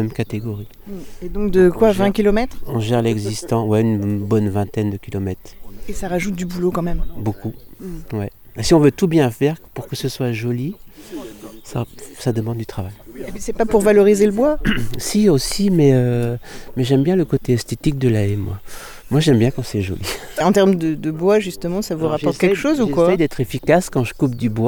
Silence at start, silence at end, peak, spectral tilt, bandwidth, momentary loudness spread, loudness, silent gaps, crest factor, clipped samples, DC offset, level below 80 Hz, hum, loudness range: 0 s; 0 s; -2 dBFS; -6.5 dB/octave; over 20 kHz; 17 LU; -18 LUFS; none; 16 dB; under 0.1%; under 0.1%; -34 dBFS; none; 8 LU